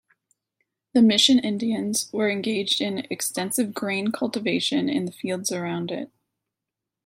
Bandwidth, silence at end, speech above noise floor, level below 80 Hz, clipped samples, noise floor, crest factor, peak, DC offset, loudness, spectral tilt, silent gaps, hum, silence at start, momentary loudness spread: 16.5 kHz; 1 s; 63 dB; -70 dBFS; under 0.1%; -86 dBFS; 22 dB; -4 dBFS; under 0.1%; -23 LUFS; -3.5 dB/octave; none; none; 0.95 s; 11 LU